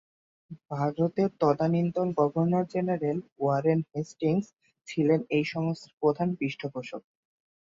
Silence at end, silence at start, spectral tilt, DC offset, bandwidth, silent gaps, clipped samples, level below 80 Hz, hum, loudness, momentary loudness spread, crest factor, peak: 0.65 s; 0.5 s; -8 dB/octave; under 0.1%; 7.6 kHz; 3.32-3.36 s, 5.93-5.97 s; under 0.1%; -70 dBFS; none; -28 LUFS; 11 LU; 18 dB; -10 dBFS